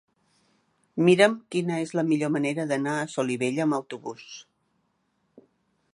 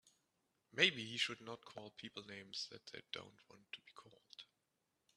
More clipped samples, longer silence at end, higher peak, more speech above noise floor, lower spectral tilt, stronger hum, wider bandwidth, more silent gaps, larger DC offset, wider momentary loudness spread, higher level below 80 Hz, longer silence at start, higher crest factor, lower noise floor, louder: neither; first, 1.5 s vs 0.7 s; first, -4 dBFS vs -14 dBFS; first, 48 dB vs 42 dB; first, -5.5 dB/octave vs -2.5 dB/octave; neither; second, 11.5 kHz vs 13 kHz; neither; neither; second, 18 LU vs 24 LU; first, -76 dBFS vs -88 dBFS; first, 0.95 s vs 0.75 s; second, 22 dB vs 32 dB; second, -72 dBFS vs -86 dBFS; first, -25 LUFS vs -41 LUFS